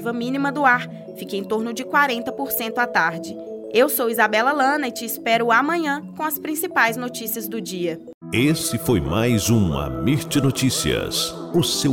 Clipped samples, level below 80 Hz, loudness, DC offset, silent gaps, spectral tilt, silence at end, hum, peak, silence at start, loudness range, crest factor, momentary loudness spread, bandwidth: under 0.1%; -44 dBFS; -21 LUFS; under 0.1%; 8.14-8.21 s; -4.5 dB/octave; 0 s; none; -4 dBFS; 0 s; 2 LU; 18 dB; 9 LU; 17 kHz